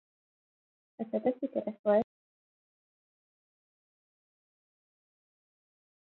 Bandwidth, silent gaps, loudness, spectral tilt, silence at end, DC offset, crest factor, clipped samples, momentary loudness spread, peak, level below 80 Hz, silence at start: 4 kHz; 1.79-1.84 s; -32 LUFS; -7 dB/octave; 4.1 s; under 0.1%; 24 dB; under 0.1%; 12 LU; -14 dBFS; -80 dBFS; 1 s